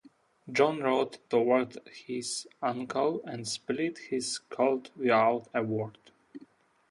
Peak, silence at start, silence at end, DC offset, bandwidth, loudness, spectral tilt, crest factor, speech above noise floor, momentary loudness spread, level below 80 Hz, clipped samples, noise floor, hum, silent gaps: -10 dBFS; 0.45 s; 0.45 s; under 0.1%; 11.5 kHz; -30 LUFS; -4 dB/octave; 22 dB; 30 dB; 10 LU; -76 dBFS; under 0.1%; -60 dBFS; none; none